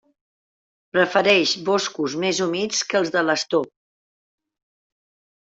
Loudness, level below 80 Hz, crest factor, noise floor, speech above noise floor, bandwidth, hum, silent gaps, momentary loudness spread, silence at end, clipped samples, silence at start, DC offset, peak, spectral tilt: -20 LUFS; -68 dBFS; 20 dB; under -90 dBFS; over 69 dB; 8 kHz; none; none; 8 LU; 1.85 s; under 0.1%; 0.95 s; under 0.1%; -4 dBFS; -3 dB/octave